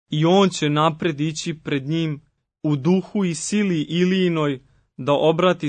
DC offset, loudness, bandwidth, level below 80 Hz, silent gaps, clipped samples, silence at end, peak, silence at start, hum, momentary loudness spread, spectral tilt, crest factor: under 0.1%; -21 LUFS; 9.6 kHz; -60 dBFS; none; under 0.1%; 0 s; -4 dBFS; 0.1 s; none; 11 LU; -5.5 dB/octave; 16 dB